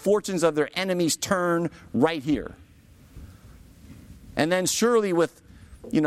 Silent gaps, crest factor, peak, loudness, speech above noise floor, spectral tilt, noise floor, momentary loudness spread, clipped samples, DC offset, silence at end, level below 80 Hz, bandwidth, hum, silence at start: none; 20 dB; -6 dBFS; -24 LUFS; 29 dB; -4.5 dB/octave; -52 dBFS; 8 LU; under 0.1%; under 0.1%; 0 s; -52 dBFS; 16 kHz; none; 0 s